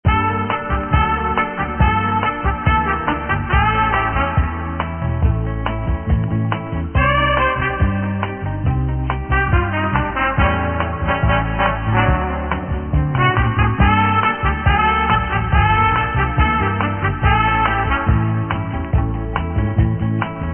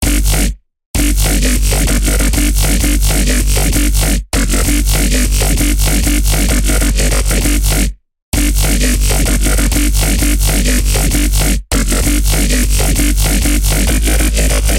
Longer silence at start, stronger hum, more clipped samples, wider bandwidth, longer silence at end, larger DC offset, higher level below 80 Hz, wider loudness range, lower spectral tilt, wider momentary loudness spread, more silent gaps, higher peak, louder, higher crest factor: about the same, 0.05 s vs 0 s; neither; neither; second, 3.4 kHz vs 17 kHz; about the same, 0 s vs 0 s; about the same, 0.3% vs 0.2%; second, -24 dBFS vs -12 dBFS; about the same, 3 LU vs 1 LU; first, -12 dB/octave vs -3.5 dB/octave; first, 7 LU vs 2 LU; second, none vs 0.86-0.94 s, 8.22-8.32 s; about the same, 0 dBFS vs -2 dBFS; second, -18 LUFS vs -13 LUFS; first, 16 dB vs 10 dB